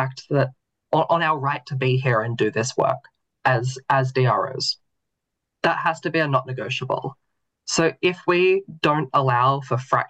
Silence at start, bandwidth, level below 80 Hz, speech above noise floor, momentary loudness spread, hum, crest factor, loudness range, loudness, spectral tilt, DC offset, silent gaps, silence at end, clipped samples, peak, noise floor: 0 s; 9 kHz; -64 dBFS; 59 dB; 7 LU; none; 16 dB; 3 LU; -22 LUFS; -5 dB/octave; under 0.1%; none; 0.05 s; under 0.1%; -6 dBFS; -81 dBFS